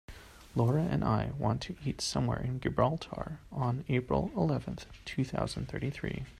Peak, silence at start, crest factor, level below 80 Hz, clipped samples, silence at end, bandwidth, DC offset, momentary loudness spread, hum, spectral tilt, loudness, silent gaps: -12 dBFS; 0.1 s; 20 dB; -50 dBFS; under 0.1%; 0 s; 13 kHz; under 0.1%; 10 LU; none; -6.5 dB/octave; -33 LUFS; none